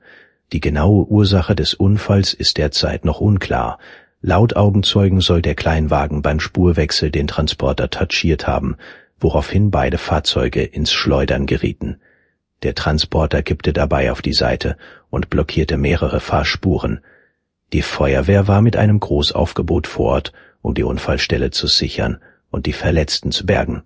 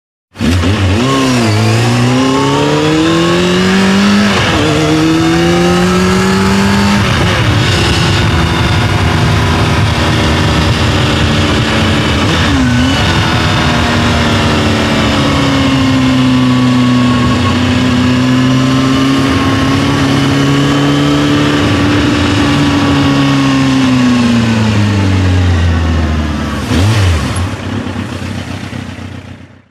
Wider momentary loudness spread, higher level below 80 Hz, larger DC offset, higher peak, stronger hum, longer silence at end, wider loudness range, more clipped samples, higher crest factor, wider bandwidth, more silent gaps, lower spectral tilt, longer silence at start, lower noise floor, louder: first, 10 LU vs 4 LU; about the same, -26 dBFS vs -24 dBFS; neither; about the same, 0 dBFS vs 0 dBFS; neither; second, 0.05 s vs 0.3 s; about the same, 3 LU vs 2 LU; neither; first, 16 dB vs 10 dB; second, 8 kHz vs 14.5 kHz; neither; about the same, -6 dB/octave vs -5.5 dB/octave; first, 0.5 s vs 0.35 s; first, -62 dBFS vs -31 dBFS; second, -17 LUFS vs -10 LUFS